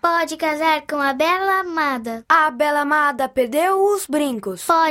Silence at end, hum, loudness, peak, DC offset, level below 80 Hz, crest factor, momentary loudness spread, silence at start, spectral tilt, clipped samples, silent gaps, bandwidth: 0 s; none; -19 LUFS; -2 dBFS; under 0.1%; -60 dBFS; 18 dB; 5 LU; 0.05 s; -3 dB/octave; under 0.1%; none; 16.5 kHz